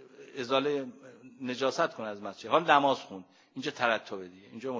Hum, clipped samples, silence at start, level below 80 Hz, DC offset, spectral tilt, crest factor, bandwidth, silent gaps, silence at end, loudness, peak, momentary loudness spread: none; under 0.1%; 0 s; -80 dBFS; under 0.1%; -4 dB/octave; 24 dB; 7.6 kHz; none; 0 s; -30 LUFS; -8 dBFS; 21 LU